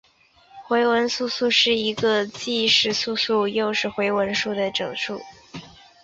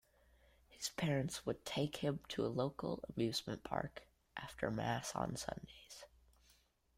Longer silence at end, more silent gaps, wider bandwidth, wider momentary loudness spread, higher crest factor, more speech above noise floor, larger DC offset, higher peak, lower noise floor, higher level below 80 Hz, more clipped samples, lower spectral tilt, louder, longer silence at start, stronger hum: second, 0.35 s vs 0.9 s; neither; second, 8 kHz vs 16 kHz; second, 12 LU vs 15 LU; about the same, 18 dB vs 20 dB; about the same, 34 dB vs 32 dB; neither; first, -4 dBFS vs -22 dBFS; second, -56 dBFS vs -73 dBFS; about the same, -62 dBFS vs -66 dBFS; neither; second, -3 dB/octave vs -5 dB/octave; first, -21 LUFS vs -42 LUFS; second, 0.55 s vs 0.7 s; neither